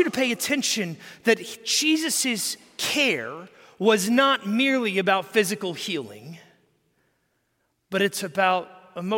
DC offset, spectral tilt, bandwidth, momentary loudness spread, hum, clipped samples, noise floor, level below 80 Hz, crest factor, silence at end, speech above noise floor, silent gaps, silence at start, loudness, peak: under 0.1%; -2.5 dB/octave; 17 kHz; 11 LU; none; under 0.1%; -73 dBFS; -76 dBFS; 18 dB; 0 s; 49 dB; none; 0 s; -23 LUFS; -6 dBFS